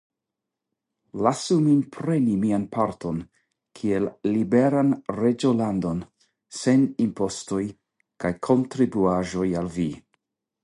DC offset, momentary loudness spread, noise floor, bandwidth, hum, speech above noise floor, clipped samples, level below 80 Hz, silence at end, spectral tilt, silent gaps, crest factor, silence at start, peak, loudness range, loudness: under 0.1%; 10 LU; -85 dBFS; 11.5 kHz; none; 62 dB; under 0.1%; -54 dBFS; 0.65 s; -7 dB/octave; none; 20 dB; 1.15 s; -4 dBFS; 2 LU; -24 LUFS